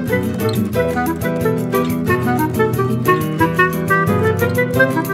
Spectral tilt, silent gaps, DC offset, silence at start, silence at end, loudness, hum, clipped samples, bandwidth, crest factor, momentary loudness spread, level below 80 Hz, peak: -6.5 dB/octave; none; under 0.1%; 0 s; 0 s; -17 LUFS; none; under 0.1%; 16 kHz; 16 dB; 4 LU; -42 dBFS; 0 dBFS